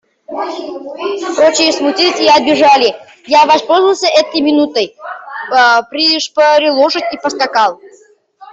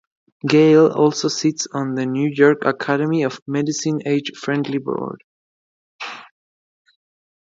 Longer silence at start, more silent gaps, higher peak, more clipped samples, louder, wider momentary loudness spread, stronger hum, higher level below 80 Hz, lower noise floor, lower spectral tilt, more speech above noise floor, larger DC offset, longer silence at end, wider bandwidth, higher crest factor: second, 0.3 s vs 0.45 s; second, none vs 3.42-3.46 s, 5.24-5.99 s; about the same, 0 dBFS vs 0 dBFS; neither; first, -11 LUFS vs -18 LUFS; second, 14 LU vs 18 LU; neither; first, -60 dBFS vs -68 dBFS; second, -40 dBFS vs under -90 dBFS; second, -2 dB/octave vs -5.5 dB/octave; second, 29 dB vs over 72 dB; neither; second, 0.05 s vs 1.15 s; about the same, 8 kHz vs 7.8 kHz; second, 12 dB vs 18 dB